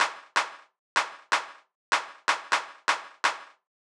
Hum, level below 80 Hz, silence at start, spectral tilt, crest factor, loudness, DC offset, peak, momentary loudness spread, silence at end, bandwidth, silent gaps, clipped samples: none; under -90 dBFS; 0 s; 1.5 dB/octave; 22 dB; -28 LUFS; under 0.1%; -8 dBFS; 3 LU; 0.4 s; over 20 kHz; 0.79-0.96 s, 1.75-1.92 s; under 0.1%